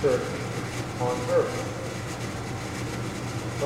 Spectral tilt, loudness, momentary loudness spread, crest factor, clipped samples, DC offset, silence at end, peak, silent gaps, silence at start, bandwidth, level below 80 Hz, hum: -5.5 dB/octave; -30 LUFS; 8 LU; 18 dB; under 0.1%; under 0.1%; 0 s; -10 dBFS; none; 0 s; 16 kHz; -48 dBFS; none